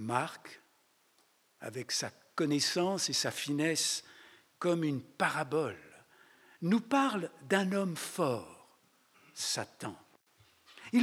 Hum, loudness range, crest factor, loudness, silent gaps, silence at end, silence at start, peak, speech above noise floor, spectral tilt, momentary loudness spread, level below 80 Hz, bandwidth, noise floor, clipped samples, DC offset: none; 4 LU; 22 dB; -33 LUFS; none; 0 s; 0 s; -14 dBFS; 37 dB; -3.5 dB/octave; 15 LU; -84 dBFS; 18.5 kHz; -70 dBFS; under 0.1%; under 0.1%